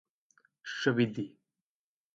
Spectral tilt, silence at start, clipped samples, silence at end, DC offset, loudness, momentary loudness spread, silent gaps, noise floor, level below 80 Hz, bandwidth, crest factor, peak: -6 dB/octave; 0.65 s; under 0.1%; 0.85 s; under 0.1%; -32 LUFS; 15 LU; none; under -90 dBFS; -76 dBFS; 7.8 kHz; 22 dB; -14 dBFS